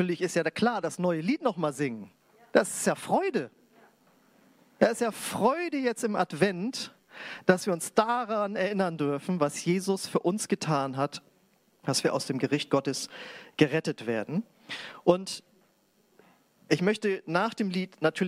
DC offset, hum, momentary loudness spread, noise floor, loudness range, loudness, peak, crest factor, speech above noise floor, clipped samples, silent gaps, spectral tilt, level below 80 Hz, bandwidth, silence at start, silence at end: under 0.1%; none; 10 LU; -67 dBFS; 3 LU; -29 LUFS; -4 dBFS; 24 dB; 39 dB; under 0.1%; none; -5 dB/octave; -74 dBFS; 16 kHz; 0 s; 0 s